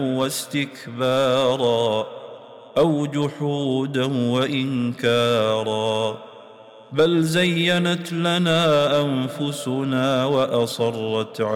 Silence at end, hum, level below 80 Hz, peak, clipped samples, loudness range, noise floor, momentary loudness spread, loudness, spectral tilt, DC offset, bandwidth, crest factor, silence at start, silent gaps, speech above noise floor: 0 s; none; -60 dBFS; -10 dBFS; under 0.1%; 2 LU; -44 dBFS; 8 LU; -21 LUFS; -5.5 dB/octave; under 0.1%; 17 kHz; 12 dB; 0 s; none; 24 dB